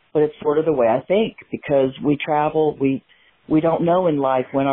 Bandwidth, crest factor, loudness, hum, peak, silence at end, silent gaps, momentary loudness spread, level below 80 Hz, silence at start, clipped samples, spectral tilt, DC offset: 3.9 kHz; 12 dB; -19 LUFS; none; -6 dBFS; 0 s; none; 5 LU; -54 dBFS; 0.15 s; under 0.1%; -12 dB/octave; under 0.1%